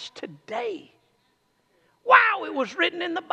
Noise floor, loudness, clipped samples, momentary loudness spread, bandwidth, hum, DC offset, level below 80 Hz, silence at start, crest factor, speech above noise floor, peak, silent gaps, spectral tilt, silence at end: -68 dBFS; -22 LUFS; under 0.1%; 21 LU; 8.8 kHz; none; under 0.1%; -84 dBFS; 0 s; 24 dB; 39 dB; -2 dBFS; none; -3 dB/octave; 0.1 s